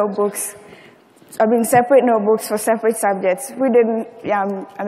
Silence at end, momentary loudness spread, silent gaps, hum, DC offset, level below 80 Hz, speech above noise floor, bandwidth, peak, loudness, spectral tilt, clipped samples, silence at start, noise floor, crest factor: 0 s; 11 LU; none; none; under 0.1%; -64 dBFS; 30 dB; 16 kHz; -2 dBFS; -17 LUFS; -5 dB/octave; under 0.1%; 0 s; -47 dBFS; 16 dB